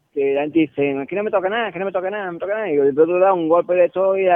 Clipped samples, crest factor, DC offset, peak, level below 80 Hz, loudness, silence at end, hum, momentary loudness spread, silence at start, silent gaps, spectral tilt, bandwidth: under 0.1%; 14 dB; under 0.1%; -4 dBFS; -64 dBFS; -19 LUFS; 0 s; none; 8 LU; 0.15 s; none; -9 dB/octave; 3.7 kHz